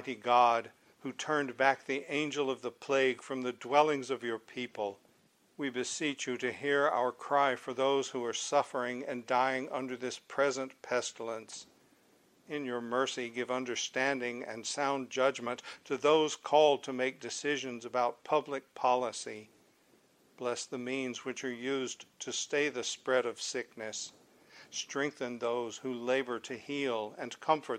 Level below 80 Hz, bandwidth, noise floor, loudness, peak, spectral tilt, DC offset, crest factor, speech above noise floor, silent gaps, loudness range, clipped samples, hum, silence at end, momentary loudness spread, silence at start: -84 dBFS; 14 kHz; -68 dBFS; -33 LUFS; -12 dBFS; -3 dB/octave; under 0.1%; 22 dB; 35 dB; none; 6 LU; under 0.1%; none; 0 s; 11 LU; 0 s